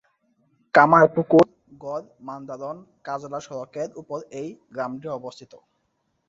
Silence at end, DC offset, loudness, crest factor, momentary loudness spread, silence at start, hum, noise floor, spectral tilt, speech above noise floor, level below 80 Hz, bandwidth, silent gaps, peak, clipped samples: 1 s; under 0.1%; -21 LUFS; 22 dB; 20 LU; 0.75 s; none; -73 dBFS; -7 dB/octave; 50 dB; -66 dBFS; 7.8 kHz; none; -2 dBFS; under 0.1%